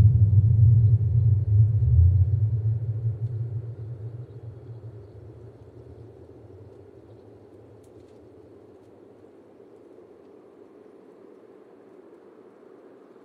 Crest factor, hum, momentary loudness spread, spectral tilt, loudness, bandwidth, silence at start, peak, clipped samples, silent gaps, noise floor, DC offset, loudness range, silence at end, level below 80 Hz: 18 dB; none; 28 LU; -12.5 dB/octave; -22 LUFS; 1.5 kHz; 0 s; -8 dBFS; under 0.1%; none; -51 dBFS; under 0.1%; 27 LU; 7.75 s; -38 dBFS